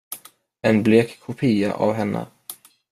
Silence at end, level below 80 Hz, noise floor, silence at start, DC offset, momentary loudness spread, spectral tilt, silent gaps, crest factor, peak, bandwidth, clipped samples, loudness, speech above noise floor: 0.35 s; -60 dBFS; -48 dBFS; 0.1 s; under 0.1%; 21 LU; -6.5 dB/octave; none; 18 dB; -2 dBFS; 15.5 kHz; under 0.1%; -21 LUFS; 28 dB